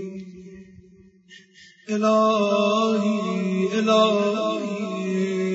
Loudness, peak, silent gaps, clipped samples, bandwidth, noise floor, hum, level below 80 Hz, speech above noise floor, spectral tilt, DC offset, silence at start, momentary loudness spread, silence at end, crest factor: -22 LUFS; -6 dBFS; none; under 0.1%; 8 kHz; -52 dBFS; none; -68 dBFS; 32 dB; -5.5 dB/octave; under 0.1%; 0 s; 12 LU; 0 s; 18 dB